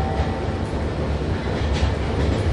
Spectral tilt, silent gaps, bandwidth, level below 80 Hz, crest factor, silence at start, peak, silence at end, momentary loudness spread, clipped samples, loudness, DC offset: -7 dB/octave; none; 11 kHz; -26 dBFS; 14 dB; 0 s; -8 dBFS; 0 s; 3 LU; under 0.1%; -24 LUFS; under 0.1%